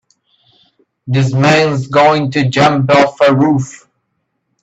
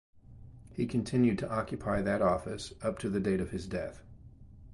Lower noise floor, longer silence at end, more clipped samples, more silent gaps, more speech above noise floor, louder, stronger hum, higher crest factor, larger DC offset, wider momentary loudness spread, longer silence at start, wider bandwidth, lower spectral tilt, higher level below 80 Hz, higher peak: first, -68 dBFS vs -52 dBFS; first, 0.9 s vs 0 s; neither; neither; first, 57 dB vs 21 dB; first, -11 LUFS vs -32 LUFS; neither; about the same, 14 dB vs 18 dB; neither; second, 6 LU vs 11 LU; first, 1.05 s vs 0.15 s; second, 8.2 kHz vs 11.5 kHz; about the same, -6 dB/octave vs -7 dB/octave; about the same, -50 dBFS vs -52 dBFS; first, 0 dBFS vs -16 dBFS